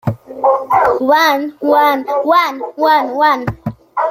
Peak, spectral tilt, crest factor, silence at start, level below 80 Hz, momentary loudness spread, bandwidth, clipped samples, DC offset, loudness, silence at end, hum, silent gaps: 0 dBFS; -5.5 dB/octave; 12 dB; 0.05 s; -48 dBFS; 9 LU; 16.5 kHz; under 0.1%; under 0.1%; -13 LUFS; 0 s; none; none